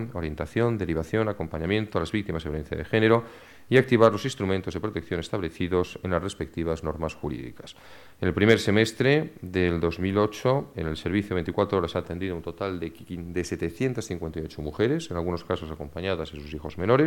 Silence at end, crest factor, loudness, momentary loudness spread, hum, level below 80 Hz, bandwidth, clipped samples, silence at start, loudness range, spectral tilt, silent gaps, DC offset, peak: 0 s; 20 dB; -27 LUFS; 12 LU; none; -46 dBFS; 17 kHz; under 0.1%; 0 s; 6 LU; -6.5 dB/octave; none; under 0.1%; -6 dBFS